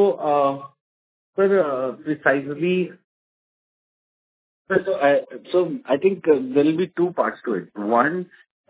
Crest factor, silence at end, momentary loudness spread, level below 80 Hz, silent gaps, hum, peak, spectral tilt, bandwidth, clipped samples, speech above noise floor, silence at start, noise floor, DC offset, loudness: 20 dB; 0.45 s; 9 LU; -70 dBFS; 0.80-1.33 s, 3.04-4.65 s; none; -2 dBFS; -10.5 dB/octave; 4 kHz; under 0.1%; over 69 dB; 0 s; under -90 dBFS; under 0.1%; -21 LUFS